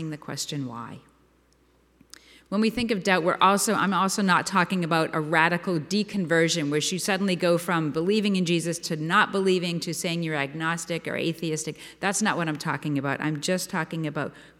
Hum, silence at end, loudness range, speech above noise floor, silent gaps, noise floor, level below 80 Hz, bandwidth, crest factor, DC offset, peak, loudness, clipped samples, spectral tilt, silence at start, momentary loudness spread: none; 0.15 s; 5 LU; 37 dB; none; -62 dBFS; -62 dBFS; 16.5 kHz; 20 dB; under 0.1%; -6 dBFS; -25 LUFS; under 0.1%; -4.5 dB/octave; 0 s; 9 LU